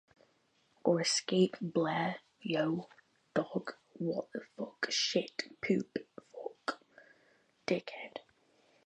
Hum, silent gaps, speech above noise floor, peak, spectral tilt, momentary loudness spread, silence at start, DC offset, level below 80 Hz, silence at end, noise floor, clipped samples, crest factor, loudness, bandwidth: none; none; 39 dB; -14 dBFS; -4 dB/octave; 16 LU; 0.85 s; under 0.1%; -80 dBFS; 0.65 s; -73 dBFS; under 0.1%; 22 dB; -35 LUFS; 10 kHz